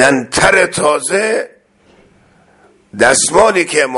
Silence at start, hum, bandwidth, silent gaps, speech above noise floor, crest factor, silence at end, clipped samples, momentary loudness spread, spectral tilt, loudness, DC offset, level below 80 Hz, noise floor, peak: 0 s; none; 12 kHz; none; 37 dB; 14 dB; 0 s; under 0.1%; 9 LU; -2.5 dB/octave; -11 LUFS; under 0.1%; -44 dBFS; -49 dBFS; 0 dBFS